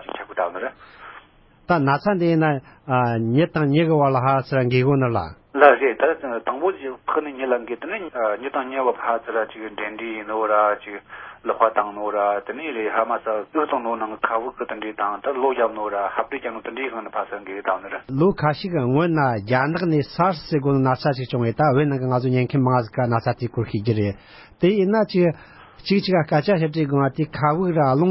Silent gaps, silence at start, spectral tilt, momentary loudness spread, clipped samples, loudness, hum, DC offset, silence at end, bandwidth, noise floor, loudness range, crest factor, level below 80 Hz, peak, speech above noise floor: none; 0 s; -11.5 dB/octave; 10 LU; under 0.1%; -21 LUFS; none; under 0.1%; 0 s; 5.8 kHz; -52 dBFS; 5 LU; 22 dB; -54 dBFS; 0 dBFS; 31 dB